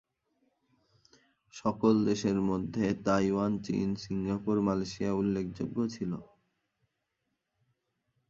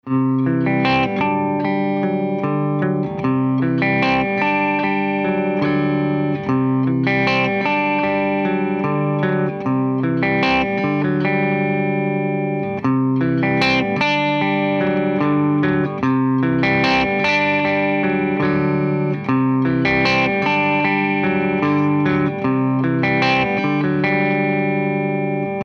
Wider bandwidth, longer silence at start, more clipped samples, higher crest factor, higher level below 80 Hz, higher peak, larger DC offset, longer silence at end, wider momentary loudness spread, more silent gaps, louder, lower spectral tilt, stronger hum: first, 7.6 kHz vs 6.8 kHz; first, 1.55 s vs 0.05 s; neither; about the same, 20 dB vs 16 dB; second, -60 dBFS vs -48 dBFS; second, -12 dBFS vs -2 dBFS; neither; first, 2.05 s vs 0 s; first, 8 LU vs 4 LU; neither; second, -31 LUFS vs -18 LUFS; about the same, -7 dB/octave vs -7.5 dB/octave; neither